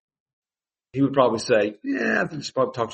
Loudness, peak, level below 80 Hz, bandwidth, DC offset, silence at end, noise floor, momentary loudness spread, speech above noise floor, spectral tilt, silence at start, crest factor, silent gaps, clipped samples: -23 LUFS; -4 dBFS; -66 dBFS; 8.4 kHz; under 0.1%; 0 s; under -90 dBFS; 6 LU; over 68 dB; -5.5 dB/octave; 0.95 s; 20 dB; none; under 0.1%